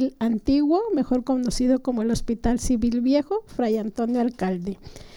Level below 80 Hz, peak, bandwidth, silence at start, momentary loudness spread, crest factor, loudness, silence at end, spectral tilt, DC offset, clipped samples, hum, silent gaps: -38 dBFS; -10 dBFS; 16.5 kHz; 0 s; 6 LU; 14 dB; -23 LUFS; 0 s; -6 dB/octave; under 0.1%; under 0.1%; none; none